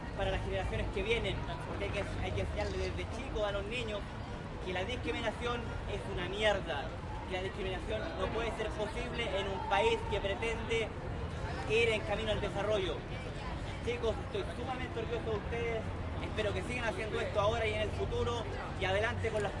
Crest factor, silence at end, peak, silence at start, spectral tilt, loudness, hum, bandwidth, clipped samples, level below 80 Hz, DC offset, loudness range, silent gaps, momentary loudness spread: 18 dB; 0 s; -18 dBFS; 0 s; -5.5 dB/octave; -36 LUFS; none; 11.5 kHz; under 0.1%; -44 dBFS; under 0.1%; 4 LU; none; 8 LU